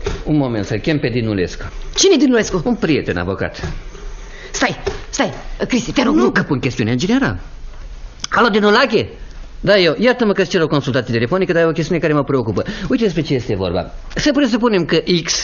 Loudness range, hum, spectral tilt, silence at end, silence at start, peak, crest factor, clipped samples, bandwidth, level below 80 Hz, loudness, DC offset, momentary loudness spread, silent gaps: 4 LU; none; -5 dB/octave; 0 s; 0 s; 0 dBFS; 16 dB; under 0.1%; 7.4 kHz; -32 dBFS; -16 LUFS; under 0.1%; 13 LU; none